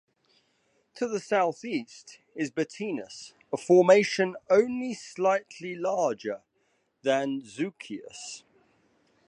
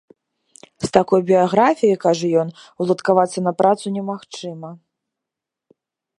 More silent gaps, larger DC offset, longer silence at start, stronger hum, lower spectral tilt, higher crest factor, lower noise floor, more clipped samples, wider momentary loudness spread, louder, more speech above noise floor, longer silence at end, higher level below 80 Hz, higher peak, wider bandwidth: neither; neither; first, 0.95 s vs 0.8 s; neither; about the same, -5 dB/octave vs -6 dB/octave; about the same, 22 dB vs 20 dB; second, -72 dBFS vs -85 dBFS; neither; first, 19 LU vs 15 LU; second, -27 LUFS vs -18 LUFS; second, 45 dB vs 67 dB; second, 0.9 s vs 1.4 s; second, -78 dBFS vs -60 dBFS; second, -6 dBFS vs 0 dBFS; about the same, 10.5 kHz vs 11 kHz